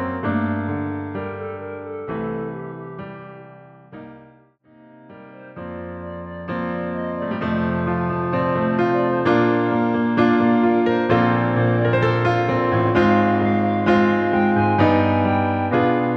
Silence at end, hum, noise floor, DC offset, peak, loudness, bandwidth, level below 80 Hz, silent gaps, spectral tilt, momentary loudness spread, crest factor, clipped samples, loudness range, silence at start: 0 s; none; -52 dBFS; under 0.1%; -4 dBFS; -19 LUFS; 6.2 kHz; -50 dBFS; none; -9 dB/octave; 16 LU; 16 dB; under 0.1%; 17 LU; 0 s